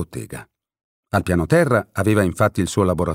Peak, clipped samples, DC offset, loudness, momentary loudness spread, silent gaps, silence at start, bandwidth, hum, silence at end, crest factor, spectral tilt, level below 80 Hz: -4 dBFS; under 0.1%; under 0.1%; -19 LUFS; 15 LU; 0.84-1.03 s; 0 s; 16 kHz; none; 0 s; 16 dB; -6.5 dB/octave; -42 dBFS